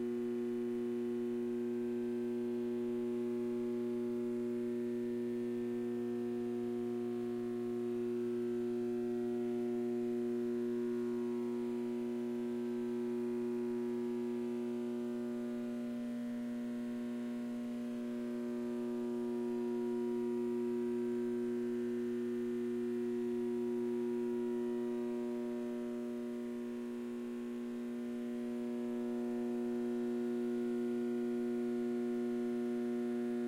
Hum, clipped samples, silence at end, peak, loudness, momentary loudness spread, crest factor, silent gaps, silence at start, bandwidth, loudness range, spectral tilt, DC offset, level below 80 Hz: none; under 0.1%; 0 s; -30 dBFS; -39 LUFS; 4 LU; 8 dB; none; 0 s; 15 kHz; 3 LU; -7 dB/octave; under 0.1%; -78 dBFS